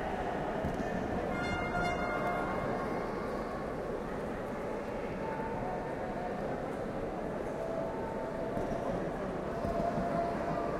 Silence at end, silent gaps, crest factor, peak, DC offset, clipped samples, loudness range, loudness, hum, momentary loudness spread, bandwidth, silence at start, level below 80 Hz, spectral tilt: 0 s; none; 16 dB; -20 dBFS; under 0.1%; under 0.1%; 3 LU; -36 LUFS; none; 5 LU; 15.5 kHz; 0 s; -50 dBFS; -7 dB/octave